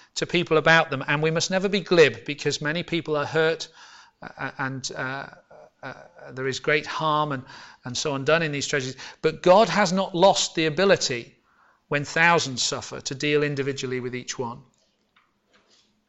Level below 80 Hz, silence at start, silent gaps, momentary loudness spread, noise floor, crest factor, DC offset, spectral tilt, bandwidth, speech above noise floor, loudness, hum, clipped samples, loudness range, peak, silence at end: -60 dBFS; 0.15 s; none; 16 LU; -65 dBFS; 20 dB; under 0.1%; -4 dB/octave; 8.4 kHz; 42 dB; -23 LUFS; none; under 0.1%; 8 LU; -6 dBFS; 1.5 s